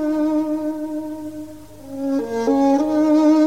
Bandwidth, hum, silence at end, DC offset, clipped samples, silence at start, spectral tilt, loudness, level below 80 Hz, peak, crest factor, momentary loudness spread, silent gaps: 11 kHz; none; 0 s; 0.5%; under 0.1%; 0 s; -6 dB/octave; -20 LUFS; -56 dBFS; -6 dBFS; 12 dB; 19 LU; none